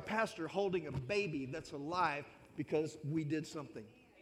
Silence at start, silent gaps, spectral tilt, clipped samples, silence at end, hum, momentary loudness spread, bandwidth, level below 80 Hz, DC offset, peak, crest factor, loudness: 0 s; none; -6 dB/octave; under 0.1%; 0 s; none; 12 LU; 14.5 kHz; -70 dBFS; under 0.1%; -20 dBFS; 18 dB; -39 LUFS